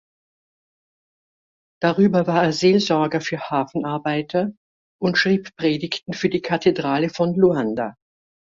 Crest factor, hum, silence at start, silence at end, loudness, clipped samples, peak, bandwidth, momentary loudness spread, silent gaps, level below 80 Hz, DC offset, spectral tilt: 18 dB; none; 1.8 s; 0.65 s; -21 LUFS; under 0.1%; -4 dBFS; 7.8 kHz; 8 LU; 4.57-4.99 s; -60 dBFS; under 0.1%; -6 dB/octave